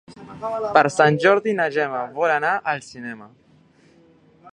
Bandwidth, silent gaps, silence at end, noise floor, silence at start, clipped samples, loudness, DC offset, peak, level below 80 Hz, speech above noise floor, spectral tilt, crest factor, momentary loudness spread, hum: 10.5 kHz; none; 0.05 s; -54 dBFS; 0.1 s; under 0.1%; -20 LUFS; under 0.1%; 0 dBFS; -66 dBFS; 34 dB; -5.5 dB/octave; 22 dB; 19 LU; none